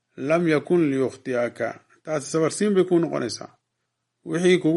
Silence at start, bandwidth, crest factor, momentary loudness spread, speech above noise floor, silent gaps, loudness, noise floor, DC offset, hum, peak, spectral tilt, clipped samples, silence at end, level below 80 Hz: 0.15 s; 11.5 kHz; 16 dB; 11 LU; 56 dB; none; -23 LUFS; -78 dBFS; under 0.1%; none; -6 dBFS; -5.5 dB/octave; under 0.1%; 0 s; -70 dBFS